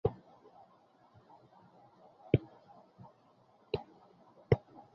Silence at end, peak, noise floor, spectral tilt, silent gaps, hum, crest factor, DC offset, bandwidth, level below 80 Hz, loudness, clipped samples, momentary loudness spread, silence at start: 0.35 s; -10 dBFS; -66 dBFS; -7.5 dB/octave; none; none; 30 dB; under 0.1%; 6 kHz; -58 dBFS; -36 LUFS; under 0.1%; 27 LU; 0.05 s